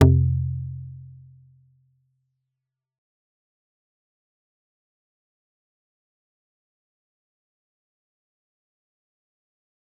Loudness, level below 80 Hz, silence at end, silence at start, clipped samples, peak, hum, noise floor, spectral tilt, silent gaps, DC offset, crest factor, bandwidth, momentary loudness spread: -23 LUFS; -48 dBFS; 8.95 s; 0 s; under 0.1%; -2 dBFS; none; -85 dBFS; -9.5 dB/octave; none; under 0.1%; 28 dB; 3.9 kHz; 24 LU